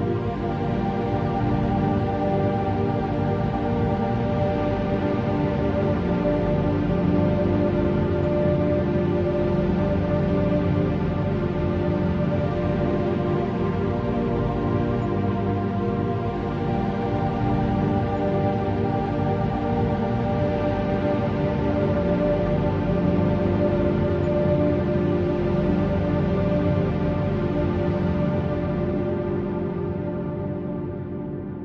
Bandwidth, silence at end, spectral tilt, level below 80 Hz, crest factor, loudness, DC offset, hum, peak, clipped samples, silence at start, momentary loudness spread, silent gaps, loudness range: 6.6 kHz; 0 s; -10 dB/octave; -38 dBFS; 14 dB; -23 LUFS; under 0.1%; 50 Hz at -40 dBFS; -8 dBFS; under 0.1%; 0 s; 4 LU; none; 2 LU